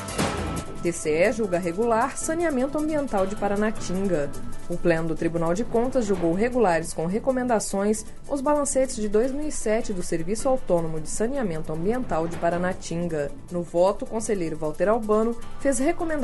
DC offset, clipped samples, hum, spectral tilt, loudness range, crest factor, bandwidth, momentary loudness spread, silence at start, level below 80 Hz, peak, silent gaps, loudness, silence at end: under 0.1%; under 0.1%; none; -5.5 dB/octave; 2 LU; 16 dB; 11.5 kHz; 7 LU; 0 s; -36 dBFS; -8 dBFS; none; -25 LUFS; 0 s